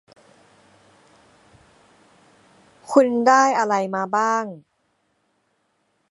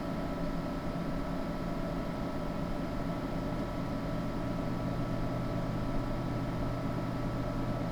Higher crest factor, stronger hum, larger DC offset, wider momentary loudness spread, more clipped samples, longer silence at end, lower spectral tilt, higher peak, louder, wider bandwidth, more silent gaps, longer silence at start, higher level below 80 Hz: first, 22 dB vs 12 dB; neither; neither; first, 8 LU vs 2 LU; neither; first, 1.55 s vs 0 s; second, -4.5 dB/octave vs -7.5 dB/octave; first, -2 dBFS vs -22 dBFS; first, -19 LUFS vs -36 LUFS; second, 11.5 kHz vs 20 kHz; neither; first, 2.9 s vs 0 s; second, -74 dBFS vs -42 dBFS